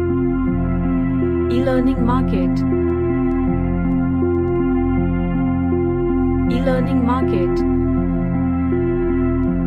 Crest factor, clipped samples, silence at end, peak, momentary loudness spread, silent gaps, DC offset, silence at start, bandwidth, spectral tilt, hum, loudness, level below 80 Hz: 12 dB; under 0.1%; 0 s; -6 dBFS; 2 LU; none; under 0.1%; 0 s; 5.6 kHz; -10 dB/octave; none; -18 LUFS; -28 dBFS